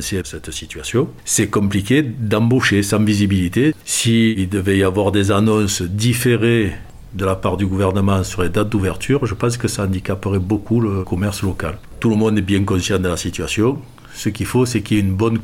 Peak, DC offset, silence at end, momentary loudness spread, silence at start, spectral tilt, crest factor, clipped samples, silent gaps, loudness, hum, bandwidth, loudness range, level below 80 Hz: -2 dBFS; 0.2%; 0 s; 8 LU; 0 s; -5.5 dB/octave; 16 dB; under 0.1%; none; -18 LUFS; none; 16.5 kHz; 3 LU; -42 dBFS